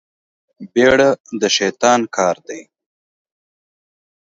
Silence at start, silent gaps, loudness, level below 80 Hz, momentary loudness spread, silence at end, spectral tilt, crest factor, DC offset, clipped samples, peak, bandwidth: 0.6 s; 1.20-1.24 s; -15 LUFS; -54 dBFS; 15 LU; 1.75 s; -3 dB/octave; 18 dB; under 0.1%; under 0.1%; 0 dBFS; 7.8 kHz